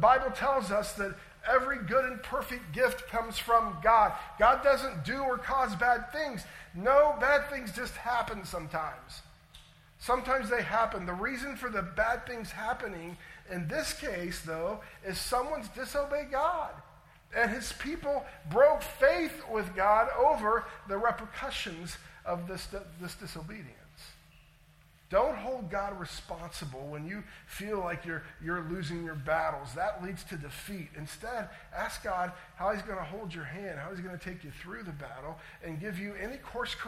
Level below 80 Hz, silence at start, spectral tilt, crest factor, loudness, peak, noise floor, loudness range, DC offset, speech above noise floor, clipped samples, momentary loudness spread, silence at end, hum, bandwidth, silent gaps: -52 dBFS; 0 s; -4.5 dB/octave; 22 dB; -32 LUFS; -10 dBFS; -61 dBFS; 10 LU; under 0.1%; 29 dB; under 0.1%; 17 LU; 0 s; none; 16 kHz; none